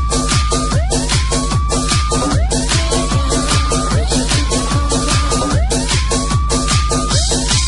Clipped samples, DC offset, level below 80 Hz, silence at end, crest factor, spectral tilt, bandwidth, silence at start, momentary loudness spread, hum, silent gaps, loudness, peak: under 0.1%; under 0.1%; -18 dBFS; 0 s; 12 dB; -4 dB/octave; 12 kHz; 0 s; 2 LU; none; none; -15 LUFS; -2 dBFS